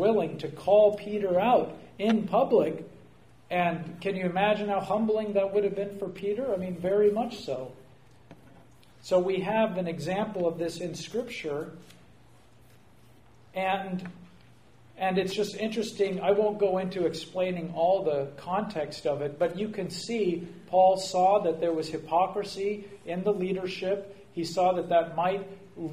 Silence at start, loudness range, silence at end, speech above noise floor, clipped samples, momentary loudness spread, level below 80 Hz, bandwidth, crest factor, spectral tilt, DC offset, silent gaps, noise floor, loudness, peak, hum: 0 s; 8 LU; 0 s; 30 dB; under 0.1%; 12 LU; -66 dBFS; 15.5 kHz; 18 dB; -6 dB/octave; 0.1%; none; -58 dBFS; -28 LUFS; -10 dBFS; none